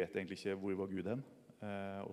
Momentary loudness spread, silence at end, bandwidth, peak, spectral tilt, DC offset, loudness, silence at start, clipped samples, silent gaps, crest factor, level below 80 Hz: 8 LU; 0 s; 13.5 kHz; -26 dBFS; -7 dB/octave; under 0.1%; -43 LUFS; 0 s; under 0.1%; none; 16 dB; -80 dBFS